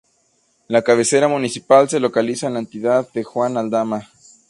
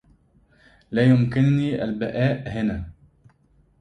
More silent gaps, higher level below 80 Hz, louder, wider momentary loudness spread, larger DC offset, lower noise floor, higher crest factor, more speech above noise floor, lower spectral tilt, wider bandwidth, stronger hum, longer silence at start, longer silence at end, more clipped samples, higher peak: neither; second, -66 dBFS vs -46 dBFS; first, -18 LUFS vs -22 LUFS; about the same, 10 LU vs 10 LU; neither; about the same, -62 dBFS vs -60 dBFS; about the same, 18 dB vs 18 dB; first, 45 dB vs 39 dB; second, -4.5 dB/octave vs -9 dB/octave; first, 11.5 kHz vs 9 kHz; neither; second, 0.7 s vs 0.9 s; second, 0.45 s vs 0.9 s; neither; first, 0 dBFS vs -6 dBFS